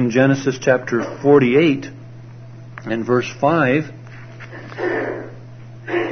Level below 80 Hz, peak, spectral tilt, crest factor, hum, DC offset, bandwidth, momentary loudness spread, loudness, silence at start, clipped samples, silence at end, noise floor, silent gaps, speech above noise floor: -54 dBFS; 0 dBFS; -6.5 dB/octave; 18 dB; none; under 0.1%; 6.6 kHz; 24 LU; -18 LUFS; 0 s; under 0.1%; 0 s; -37 dBFS; none; 20 dB